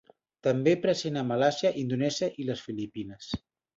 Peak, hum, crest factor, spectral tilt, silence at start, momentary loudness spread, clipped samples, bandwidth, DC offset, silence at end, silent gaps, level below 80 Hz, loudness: -10 dBFS; none; 18 dB; -5.5 dB/octave; 0.45 s; 13 LU; under 0.1%; 8 kHz; under 0.1%; 0.4 s; none; -60 dBFS; -29 LUFS